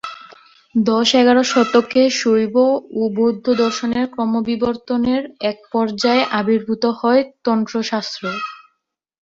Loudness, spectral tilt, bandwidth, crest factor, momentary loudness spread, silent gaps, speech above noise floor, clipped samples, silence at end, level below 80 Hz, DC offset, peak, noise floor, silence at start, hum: -17 LUFS; -4.5 dB/octave; 7.8 kHz; 16 dB; 9 LU; none; 58 dB; under 0.1%; 0.65 s; -58 dBFS; under 0.1%; -2 dBFS; -74 dBFS; 0.05 s; none